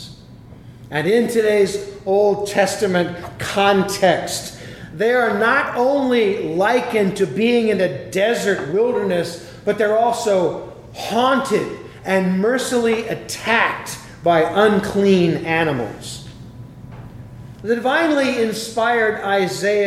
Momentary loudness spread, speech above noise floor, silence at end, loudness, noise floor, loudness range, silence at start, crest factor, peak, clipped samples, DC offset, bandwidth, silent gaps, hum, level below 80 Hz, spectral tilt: 15 LU; 23 dB; 0 s; -18 LUFS; -40 dBFS; 3 LU; 0 s; 18 dB; -2 dBFS; under 0.1%; under 0.1%; 15.5 kHz; none; none; -50 dBFS; -5 dB/octave